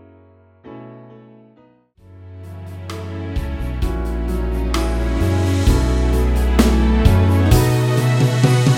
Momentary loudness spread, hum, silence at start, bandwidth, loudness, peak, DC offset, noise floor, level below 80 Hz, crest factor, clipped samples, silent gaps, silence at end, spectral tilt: 20 LU; none; 0.65 s; 16.5 kHz; -17 LUFS; 0 dBFS; under 0.1%; -52 dBFS; -22 dBFS; 16 dB; under 0.1%; none; 0 s; -6.5 dB/octave